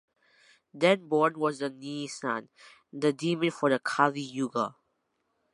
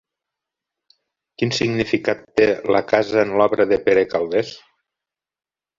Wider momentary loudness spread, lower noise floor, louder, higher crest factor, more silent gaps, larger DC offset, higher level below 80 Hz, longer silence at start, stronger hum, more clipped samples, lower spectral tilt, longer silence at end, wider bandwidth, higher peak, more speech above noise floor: first, 10 LU vs 6 LU; second, -77 dBFS vs under -90 dBFS; second, -29 LUFS vs -19 LUFS; about the same, 22 dB vs 20 dB; neither; neither; second, -82 dBFS vs -54 dBFS; second, 0.75 s vs 1.4 s; neither; neither; about the same, -5 dB/octave vs -5.5 dB/octave; second, 0.8 s vs 1.2 s; first, 11.5 kHz vs 7.6 kHz; second, -8 dBFS vs 0 dBFS; second, 49 dB vs over 72 dB